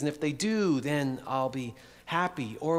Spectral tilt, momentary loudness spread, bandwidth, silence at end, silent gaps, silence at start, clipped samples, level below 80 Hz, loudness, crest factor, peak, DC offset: -5.5 dB/octave; 10 LU; 15.5 kHz; 0 s; none; 0 s; under 0.1%; -66 dBFS; -30 LUFS; 18 dB; -12 dBFS; under 0.1%